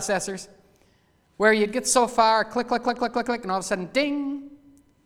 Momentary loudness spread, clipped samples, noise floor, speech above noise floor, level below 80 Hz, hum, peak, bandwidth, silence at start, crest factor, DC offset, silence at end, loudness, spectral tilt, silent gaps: 11 LU; under 0.1%; -63 dBFS; 39 dB; -58 dBFS; none; -6 dBFS; 17 kHz; 0 s; 20 dB; under 0.1%; 0.5 s; -23 LUFS; -3 dB/octave; none